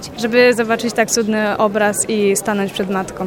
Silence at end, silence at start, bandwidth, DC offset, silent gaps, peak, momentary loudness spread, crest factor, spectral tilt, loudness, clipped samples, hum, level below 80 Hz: 0 s; 0 s; 17.5 kHz; 0.1%; none; 0 dBFS; 7 LU; 16 dB; -3.5 dB/octave; -16 LUFS; under 0.1%; none; -52 dBFS